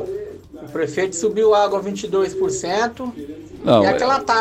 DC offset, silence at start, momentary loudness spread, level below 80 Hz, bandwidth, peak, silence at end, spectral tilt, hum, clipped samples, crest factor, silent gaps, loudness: under 0.1%; 0 s; 16 LU; -52 dBFS; 14 kHz; -2 dBFS; 0 s; -4.5 dB/octave; none; under 0.1%; 16 dB; none; -19 LUFS